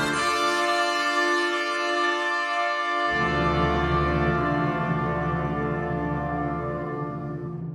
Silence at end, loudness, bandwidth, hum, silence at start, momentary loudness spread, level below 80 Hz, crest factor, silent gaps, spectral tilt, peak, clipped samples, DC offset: 0 s; -24 LUFS; 15.5 kHz; none; 0 s; 7 LU; -40 dBFS; 14 dB; none; -5 dB/octave; -10 dBFS; under 0.1%; under 0.1%